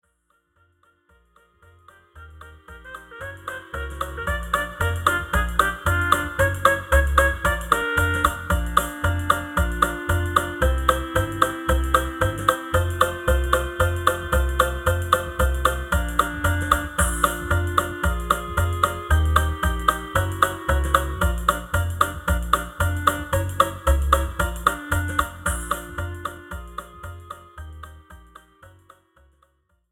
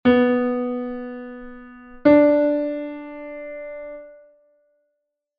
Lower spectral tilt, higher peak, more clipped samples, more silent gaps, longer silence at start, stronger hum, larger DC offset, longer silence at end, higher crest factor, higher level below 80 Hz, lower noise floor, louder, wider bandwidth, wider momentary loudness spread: second, -4.5 dB/octave vs -8.5 dB/octave; about the same, -2 dBFS vs -4 dBFS; neither; neither; first, 2.15 s vs 0.05 s; neither; neither; about the same, 1.25 s vs 1.25 s; about the same, 22 dB vs 18 dB; first, -28 dBFS vs -54 dBFS; second, -68 dBFS vs -77 dBFS; second, -22 LUFS vs -19 LUFS; first, 18.5 kHz vs 4.9 kHz; second, 13 LU vs 23 LU